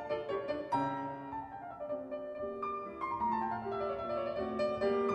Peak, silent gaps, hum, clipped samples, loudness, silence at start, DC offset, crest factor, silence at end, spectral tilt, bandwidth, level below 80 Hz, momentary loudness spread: -20 dBFS; none; none; under 0.1%; -37 LUFS; 0 s; under 0.1%; 16 dB; 0 s; -7 dB/octave; 9.6 kHz; -66 dBFS; 9 LU